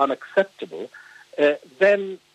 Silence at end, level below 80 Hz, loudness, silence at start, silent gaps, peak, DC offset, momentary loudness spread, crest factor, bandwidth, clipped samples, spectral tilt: 0.2 s; -84 dBFS; -21 LUFS; 0 s; none; -4 dBFS; under 0.1%; 18 LU; 18 dB; 9 kHz; under 0.1%; -5.5 dB/octave